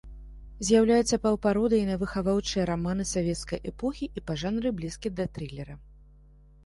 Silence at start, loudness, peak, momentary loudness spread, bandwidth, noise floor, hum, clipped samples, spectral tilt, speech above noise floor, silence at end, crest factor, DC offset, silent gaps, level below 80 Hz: 0.05 s; -27 LUFS; -10 dBFS; 14 LU; 11.5 kHz; -54 dBFS; none; under 0.1%; -5.5 dB/octave; 27 dB; 0.7 s; 18 dB; under 0.1%; none; -46 dBFS